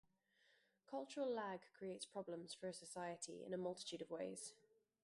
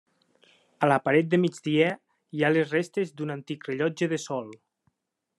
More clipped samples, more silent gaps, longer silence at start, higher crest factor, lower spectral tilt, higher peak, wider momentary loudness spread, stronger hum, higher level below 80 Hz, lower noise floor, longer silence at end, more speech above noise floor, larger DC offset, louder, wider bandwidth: neither; neither; about the same, 0.9 s vs 0.8 s; about the same, 16 dB vs 20 dB; second, -4 dB/octave vs -6 dB/octave; second, -34 dBFS vs -8 dBFS; second, 7 LU vs 12 LU; neither; second, -88 dBFS vs -74 dBFS; about the same, -79 dBFS vs -78 dBFS; second, 0.5 s vs 0.85 s; second, 30 dB vs 52 dB; neither; second, -50 LUFS vs -26 LUFS; about the same, 11.5 kHz vs 11.5 kHz